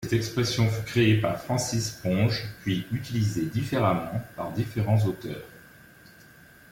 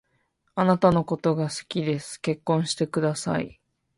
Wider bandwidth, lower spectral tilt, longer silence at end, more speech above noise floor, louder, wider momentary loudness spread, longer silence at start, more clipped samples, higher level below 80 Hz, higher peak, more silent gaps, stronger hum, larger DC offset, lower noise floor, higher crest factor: first, 17 kHz vs 11.5 kHz; about the same, -5.5 dB/octave vs -6 dB/octave; first, 1.1 s vs 0.5 s; second, 26 dB vs 47 dB; about the same, -27 LUFS vs -25 LUFS; about the same, 10 LU vs 9 LU; second, 0 s vs 0.55 s; neither; about the same, -54 dBFS vs -56 dBFS; second, -10 dBFS vs -6 dBFS; neither; neither; neither; second, -52 dBFS vs -71 dBFS; about the same, 16 dB vs 20 dB